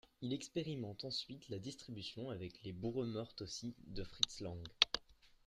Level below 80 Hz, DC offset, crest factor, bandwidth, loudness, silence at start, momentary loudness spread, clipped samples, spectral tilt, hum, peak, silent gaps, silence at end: -64 dBFS; under 0.1%; 32 dB; 14 kHz; -42 LUFS; 0.2 s; 14 LU; under 0.1%; -4 dB/octave; none; -12 dBFS; none; 0.2 s